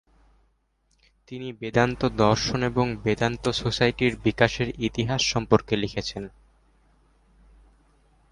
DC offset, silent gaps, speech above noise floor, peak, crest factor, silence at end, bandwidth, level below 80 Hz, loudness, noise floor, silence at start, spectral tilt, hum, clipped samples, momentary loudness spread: under 0.1%; none; 44 dB; -4 dBFS; 22 dB; 2.05 s; 11 kHz; -46 dBFS; -24 LUFS; -68 dBFS; 1.3 s; -5 dB/octave; none; under 0.1%; 12 LU